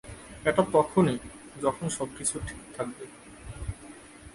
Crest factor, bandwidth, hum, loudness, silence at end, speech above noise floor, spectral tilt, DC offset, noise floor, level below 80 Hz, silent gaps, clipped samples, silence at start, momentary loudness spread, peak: 22 dB; 11.5 kHz; none; -29 LUFS; 0.05 s; 20 dB; -5 dB/octave; under 0.1%; -48 dBFS; -50 dBFS; none; under 0.1%; 0.05 s; 21 LU; -8 dBFS